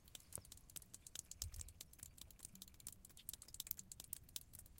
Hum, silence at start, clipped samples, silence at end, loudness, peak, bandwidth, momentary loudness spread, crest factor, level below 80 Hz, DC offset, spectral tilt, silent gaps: none; 0 s; under 0.1%; 0 s; -53 LUFS; -20 dBFS; 17 kHz; 8 LU; 36 dB; -66 dBFS; under 0.1%; -1.5 dB/octave; none